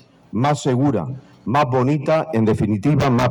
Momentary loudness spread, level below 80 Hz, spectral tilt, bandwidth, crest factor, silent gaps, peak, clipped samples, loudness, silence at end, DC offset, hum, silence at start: 8 LU; -46 dBFS; -7.5 dB/octave; 11.5 kHz; 10 dB; none; -10 dBFS; under 0.1%; -19 LUFS; 0 s; under 0.1%; none; 0.35 s